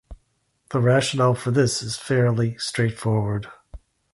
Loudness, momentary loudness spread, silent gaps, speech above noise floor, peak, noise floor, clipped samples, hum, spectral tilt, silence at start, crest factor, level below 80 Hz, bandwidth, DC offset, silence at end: -22 LUFS; 9 LU; none; 47 dB; -6 dBFS; -69 dBFS; under 0.1%; none; -5.5 dB/octave; 0.1 s; 18 dB; -48 dBFS; 11.5 kHz; under 0.1%; 0.35 s